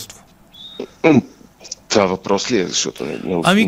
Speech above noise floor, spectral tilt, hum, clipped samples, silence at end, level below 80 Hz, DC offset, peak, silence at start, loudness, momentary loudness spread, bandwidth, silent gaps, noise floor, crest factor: 28 dB; -4 dB/octave; none; under 0.1%; 0 s; -54 dBFS; under 0.1%; 0 dBFS; 0 s; -17 LUFS; 19 LU; 16 kHz; none; -44 dBFS; 18 dB